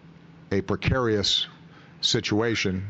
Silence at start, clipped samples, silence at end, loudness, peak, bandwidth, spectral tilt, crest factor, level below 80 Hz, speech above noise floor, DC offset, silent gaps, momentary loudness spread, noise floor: 0.05 s; under 0.1%; 0 s; -24 LUFS; -10 dBFS; 8.2 kHz; -4 dB/octave; 16 dB; -44 dBFS; 24 dB; under 0.1%; none; 8 LU; -49 dBFS